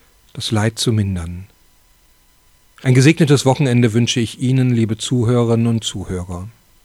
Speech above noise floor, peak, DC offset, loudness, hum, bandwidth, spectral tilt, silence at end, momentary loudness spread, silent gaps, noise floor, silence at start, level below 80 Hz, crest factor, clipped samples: 38 dB; -2 dBFS; under 0.1%; -16 LUFS; none; 13.5 kHz; -6 dB/octave; 0.35 s; 16 LU; none; -53 dBFS; 0.35 s; -46 dBFS; 16 dB; under 0.1%